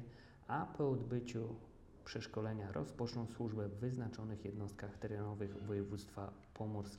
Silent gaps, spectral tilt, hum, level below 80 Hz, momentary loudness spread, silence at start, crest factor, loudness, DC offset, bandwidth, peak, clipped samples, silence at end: none; -7.5 dB/octave; none; -64 dBFS; 10 LU; 0 s; 16 dB; -44 LUFS; under 0.1%; 12 kHz; -28 dBFS; under 0.1%; 0 s